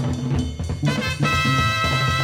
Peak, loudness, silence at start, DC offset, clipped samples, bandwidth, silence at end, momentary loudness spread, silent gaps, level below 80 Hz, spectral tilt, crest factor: -8 dBFS; -21 LUFS; 0 s; under 0.1%; under 0.1%; 16.5 kHz; 0 s; 6 LU; none; -34 dBFS; -5 dB/octave; 14 dB